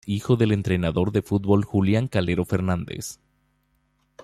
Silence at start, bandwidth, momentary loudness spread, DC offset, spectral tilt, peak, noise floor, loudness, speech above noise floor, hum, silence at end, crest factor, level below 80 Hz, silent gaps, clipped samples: 0.05 s; 14 kHz; 8 LU; under 0.1%; -7 dB/octave; -6 dBFS; -68 dBFS; -23 LUFS; 46 dB; none; 1.1 s; 18 dB; -50 dBFS; none; under 0.1%